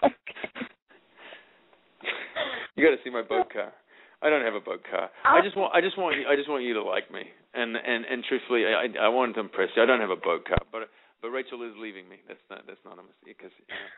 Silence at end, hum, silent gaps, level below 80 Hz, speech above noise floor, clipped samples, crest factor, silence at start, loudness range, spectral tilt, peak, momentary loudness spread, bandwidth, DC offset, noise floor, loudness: 0 s; none; 0.82-0.86 s; -52 dBFS; 34 dB; under 0.1%; 22 dB; 0 s; 5 LU; -2 dB/octave; -6 dBFS; 19 LU; 4.1 kHz; under 0.1%; -61 dBFS; -26 LUFS